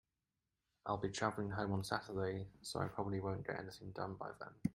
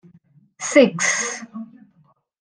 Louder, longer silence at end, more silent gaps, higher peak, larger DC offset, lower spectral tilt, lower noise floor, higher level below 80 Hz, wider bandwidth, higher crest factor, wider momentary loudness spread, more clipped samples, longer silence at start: second, -43 LUFS vs -18 LUFS; second, 0 s vs 0.75 s; neither; second, -20 dBFS vs -2 dBFS; neither; first, -5.5 dB/octave vs -3 dB/octave; first, under -90 dBFS vs -60 dBFS; about the same, -68 dBFS vs -72 dBFS; first, 16 kHz vs 10.5 kHz; about the same, 24 dB vs 20 dB; second, 8 LU vs 22 LU; neither; first, 0.85 s vs 0.6 s